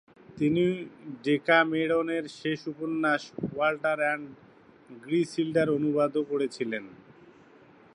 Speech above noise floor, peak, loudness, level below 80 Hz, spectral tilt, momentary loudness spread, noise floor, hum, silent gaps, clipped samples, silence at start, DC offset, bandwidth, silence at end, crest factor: 28 dB; -10 dBFS; -28 LUFS; -68 dBFS; -6 dB/octave; 12 LU; -55 dBFS; none; none; under 0.1%; 0.3 s; under 0.1%; 11 kHz; 1 s; 20 dB